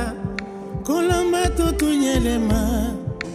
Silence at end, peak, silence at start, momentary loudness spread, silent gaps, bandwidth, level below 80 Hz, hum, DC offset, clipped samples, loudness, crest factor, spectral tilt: 0 s; -8 dBFS; 0 s; 10 LU; none; 15.5 kHz; -30 dBFS; none; under 0.1%; under 0.1%; -21 LUFS; 14 dB; -5.5 dB/octave